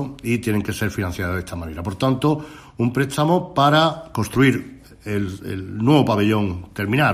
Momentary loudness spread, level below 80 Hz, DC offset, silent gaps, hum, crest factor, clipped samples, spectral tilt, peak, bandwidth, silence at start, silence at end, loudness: 13 LU; -48 dBFS; under 0.1%; none; none; 18 dB; under 0.1%; -6 dB/octave; -2 dBFS; 15.5 kHz; 0 s; 0 s; -21 LUFS